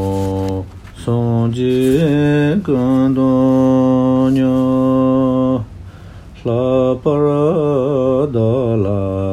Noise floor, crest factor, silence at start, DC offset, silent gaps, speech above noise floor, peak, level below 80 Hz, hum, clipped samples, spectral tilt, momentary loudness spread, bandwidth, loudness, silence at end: -35 dBFS; 12 dB; 0 s; under 0.1%; none; 22 dB; -2 dBFS; -40 dBFS; none; under 0.1%; -8.5 dB/octave; 8 LU; 12.5 kHz; -15 LUFS; 0 s